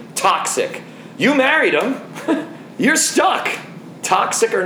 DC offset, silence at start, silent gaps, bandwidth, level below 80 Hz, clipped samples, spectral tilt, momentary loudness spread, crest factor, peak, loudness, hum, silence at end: under 0.1%; 0 s; none; over 20 kHz; -68 dBFS; under 0.1%; -2.5 dB/octave; 14 LU; 16 dB; -2 dBFS; -17 LUFS; none; 0 s